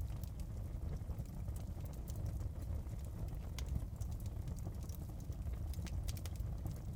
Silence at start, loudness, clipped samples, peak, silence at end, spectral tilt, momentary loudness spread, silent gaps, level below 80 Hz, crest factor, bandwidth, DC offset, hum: 0 s; -46 LUFS; under 0.1%; -24 dBFS; 0 s; -6.5 dB/octave; 3 LU; none; -46 dBFS; 18 dB; 18 kHz; under 0.1%; none